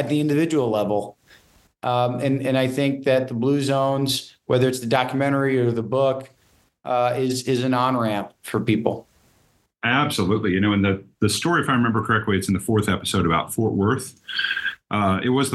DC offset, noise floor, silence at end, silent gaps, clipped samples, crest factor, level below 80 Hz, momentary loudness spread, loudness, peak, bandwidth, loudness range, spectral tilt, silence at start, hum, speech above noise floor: under 0.1%; -62 dBFS; 0 s; none; under 0.1%; 18 dB; -54 dBFS; 6 LU; -22 LUFS; -4 dBFS; 13 kHz; 2 LU; -5.5 dB/octave; 0 s; none; 41 dB